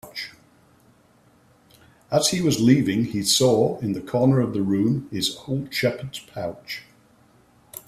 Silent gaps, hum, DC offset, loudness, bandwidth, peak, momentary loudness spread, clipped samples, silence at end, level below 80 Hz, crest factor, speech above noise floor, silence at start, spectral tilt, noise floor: none; none; under 0.1%; -22 LUFS; 15.5 kHz; -4 dBFS; 16 LU; under 0.1%; 0.1 s; -58 dBFS; 20 dB; 36 dB; 0.05 s; -5 dB/octave; -57 dBFS